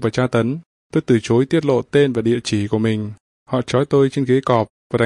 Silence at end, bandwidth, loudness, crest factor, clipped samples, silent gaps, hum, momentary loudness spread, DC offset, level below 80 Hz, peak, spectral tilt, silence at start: 0 s; 11 kHz; -18 LUFS; 16 dB; under 0.1%; 0.66-0.90 s, 3.20-3.46 s, 4.70-4.90 s; none; 8 LU; under 0.1%; -54 dBFS; -2 dBFS; -7 dB/octave; 0 s